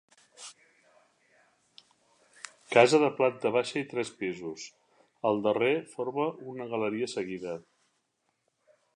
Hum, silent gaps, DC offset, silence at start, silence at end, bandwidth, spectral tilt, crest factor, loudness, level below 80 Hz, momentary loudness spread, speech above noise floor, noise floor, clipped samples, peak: none; none; under 0.1%; 0.4 s; 1.35 s; 11.5 kHz; -4.5 dB/octave; 26 dB; -29 LUFS; -78 dBFS; 24 LU; 49 dB; -78 dBFS; under 0.1%; -6 dBFS